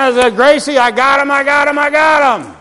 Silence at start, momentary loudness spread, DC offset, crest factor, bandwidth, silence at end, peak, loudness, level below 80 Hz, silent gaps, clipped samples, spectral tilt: 0 s; 2 LU; 0.3%; 10 dB; 11.5 kHz; 0.05 s; 0 dBFS; -10 LUFS; -48 dBFS; none; 0.4%; -2.5 dB/octave